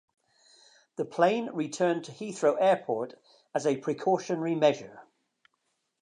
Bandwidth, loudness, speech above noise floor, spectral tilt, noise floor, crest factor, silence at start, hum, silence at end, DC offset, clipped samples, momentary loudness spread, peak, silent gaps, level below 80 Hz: 10.5 kHz; -28 LUFS; 50 dB; -5.5 dB/octave; -78 dBFS; 20 dB; 1 s; none; 1 s; under 0.1%; under 0.1%; 12 LU; -10 dBFS; none; -84 dBFS